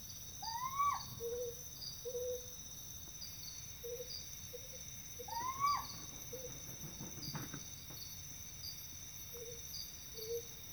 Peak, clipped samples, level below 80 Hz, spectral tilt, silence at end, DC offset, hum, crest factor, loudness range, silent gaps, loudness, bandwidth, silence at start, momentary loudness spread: -26 dBFS; under 0.1%; -64 dBFS; -2 dB/octave; 0 s; under 0.1%; none; 20 dB; 4 LU; none; -44 LUFS; over 20 kHz; 0 s; 10 LU